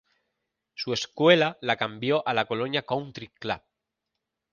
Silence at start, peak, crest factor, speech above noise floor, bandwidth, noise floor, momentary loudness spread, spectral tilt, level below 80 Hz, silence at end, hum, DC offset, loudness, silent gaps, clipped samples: 0.8 s; -6 dBFS; 22 dB; 58 dB; 7.2 kHz; -84 dBFS; 15 LU; -5 dB/octave; -66 dBFS; 0.95 s; none; under 0.1%; -26 LUFS; none; under 0.1%